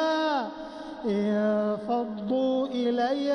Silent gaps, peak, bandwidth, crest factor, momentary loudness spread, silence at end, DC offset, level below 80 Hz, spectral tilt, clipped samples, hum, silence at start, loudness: none; -16 dBFS; 9.6 kHz; 12 dB; 9 LU; 0 s; under 0.1%; -64 dBFS; -6.5 dB/octave; under 0.1%; none; 0 s; -27 LUFS